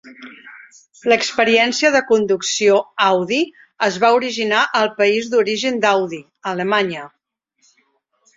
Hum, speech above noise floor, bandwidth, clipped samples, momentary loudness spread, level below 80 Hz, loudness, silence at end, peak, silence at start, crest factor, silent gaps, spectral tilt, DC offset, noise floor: none; 47 dB; 7.8 kHz; under 0.1%; 11 LU; -64 dBFS; -17 LUFS; 1.3 s; -2 dBFS; 0.05 s; 16 dB; none; -3 dB/octave; under 0.1%; -64 dBFS